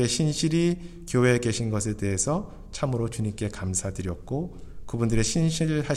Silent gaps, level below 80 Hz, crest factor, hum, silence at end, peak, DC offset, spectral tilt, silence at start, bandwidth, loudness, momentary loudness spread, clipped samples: none; -42 dBFS; 18 dB; none; 0 s; -8 dBFS; under 0.1%; -5 dB/octave; 0 s; 13.5 kHz; -26 LUFS; 10 LU; under 0.1%